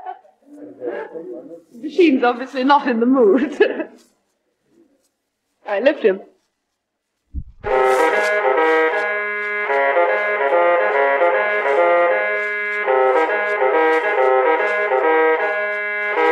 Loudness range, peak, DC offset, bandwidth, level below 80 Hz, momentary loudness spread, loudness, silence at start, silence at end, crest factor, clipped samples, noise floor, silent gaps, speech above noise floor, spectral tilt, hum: 6 LU; 0 dBFS; under 0.1%; 12 kHz; -48 dBFS; 15 LU; -17 LUFS; 0 s; 0 s; 18 dB; under 0.1%; -75 dBFS; none; 58 dB; -5 dB/octave; none